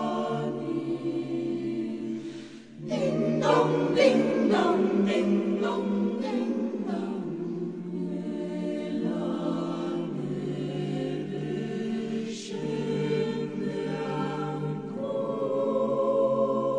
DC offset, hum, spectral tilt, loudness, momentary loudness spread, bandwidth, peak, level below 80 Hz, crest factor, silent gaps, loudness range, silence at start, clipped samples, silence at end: under 0.1%; none; -7 dB/octave; -28 LUFS; 10 LU; 10 kHz; -8 dBFS; -74 dBFS; 20 dB; none; 7 LU; 0 s; under 0.1%; 0 s